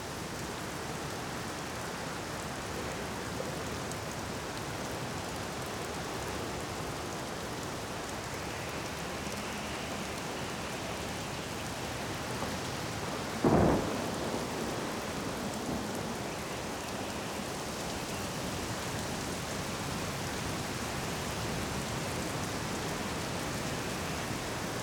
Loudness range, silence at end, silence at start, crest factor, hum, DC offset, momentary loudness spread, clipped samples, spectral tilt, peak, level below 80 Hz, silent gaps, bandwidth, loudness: 5 LU; 0 s; 0 s; 22 dB; none; under 0.1%; 3 LU; under 0.1%; -4 dB/octave; -14 dBFS; -52 dBFS; none; over 20 kHz; -36 LUFS